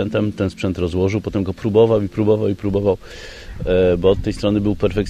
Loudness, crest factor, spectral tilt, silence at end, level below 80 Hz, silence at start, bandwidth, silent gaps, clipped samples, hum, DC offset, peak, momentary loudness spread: -18 LUFS; 16 dB; -7.5 dB/octave; 0 s; -36 dBFS; 0 s; 10.5 kHz; none; under 0.1%; none; under 0.1%; -2 dBFS; 9 LU